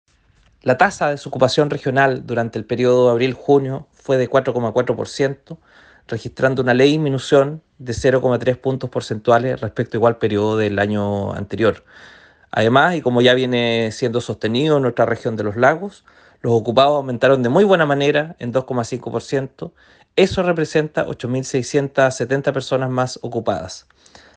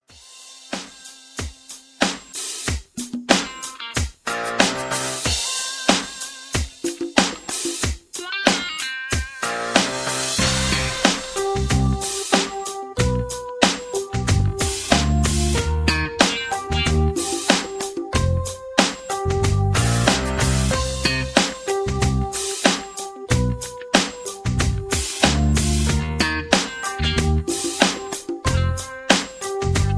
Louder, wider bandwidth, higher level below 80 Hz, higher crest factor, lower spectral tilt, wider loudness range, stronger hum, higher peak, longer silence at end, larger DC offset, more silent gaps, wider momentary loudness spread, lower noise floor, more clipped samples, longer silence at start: first, -18 LUFS vs -21 LUFS; second, 9.6 kHz vs 11 kHz; second, -50 dBFS vs -30 dBFS; about the same, 18 dB vs 22 dB; first, -6 dB/octave vs -3.5 dB/octave; about the same, 3 LU vs 3 LU; neither; about the same, 0 dBFS vs 0 dBFS; first, 0.55 s vs 0 s; neither; neither; about the same, 10 LU vs 10 LU; first, -56 dBFS vs -45 dBFS; neither; first, 0.65 s vs 0.15 s